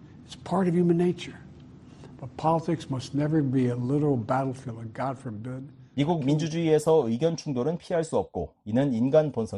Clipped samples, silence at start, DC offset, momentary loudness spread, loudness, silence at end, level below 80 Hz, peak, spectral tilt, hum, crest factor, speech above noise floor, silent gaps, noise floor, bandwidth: under 0.1%; 0 s; under 0.1%; 15 LU; -26 LUFS; 0 s; -58 dBFS; -8 dBFS; -7.5 dB/octave; none; 18 dB; 22 dB; none; -48 dBFS; 11.5 kHz